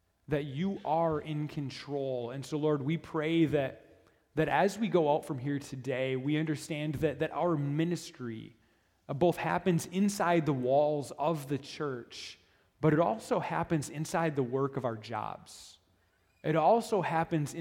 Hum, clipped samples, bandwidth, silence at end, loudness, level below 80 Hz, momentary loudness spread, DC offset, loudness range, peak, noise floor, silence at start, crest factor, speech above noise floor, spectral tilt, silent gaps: none; under 0.1%; 16.5 kHz; 0 s; -32 LUFS; -64 dBFS; 11 LU; under 0.1%; 3 LU; -12 dBFS; -70 dBFS; 0.3 s; 20 dB; 39 dB; -6.5 dB/octave; none